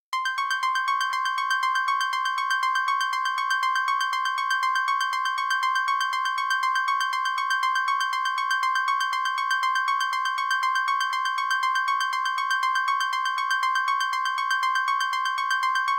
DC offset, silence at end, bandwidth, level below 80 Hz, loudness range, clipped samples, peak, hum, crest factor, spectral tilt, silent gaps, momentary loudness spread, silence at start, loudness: under 0.1%; 0 s; 16.5 kHz; -82 dBFS; 0 LU; under 0.1%; -14 dBFS; none; 12 dB; 4.5 dB/octave; none; 2 LU; 0.1 s; -24 LUFS